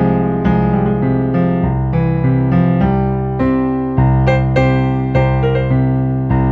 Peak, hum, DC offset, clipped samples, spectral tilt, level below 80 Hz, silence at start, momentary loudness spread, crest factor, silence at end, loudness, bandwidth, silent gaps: 0 dBFS; none; under 0.1%; under 0.1%; -10 dB/octave; -26 dBFS; 0 s; 3 LU; 14 dB; 0 s; -14 LUFS; 4.6 kHz; none